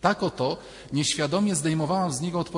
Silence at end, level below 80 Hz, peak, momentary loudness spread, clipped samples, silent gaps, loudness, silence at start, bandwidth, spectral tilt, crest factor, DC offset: 0 s; -56 dBFS; -6 dBFS; 5 LU; under 0.1%; none; -26 LUFS; 0 s; 11 kHz; -4.5 dB/octave; 20 dB; under 0.1%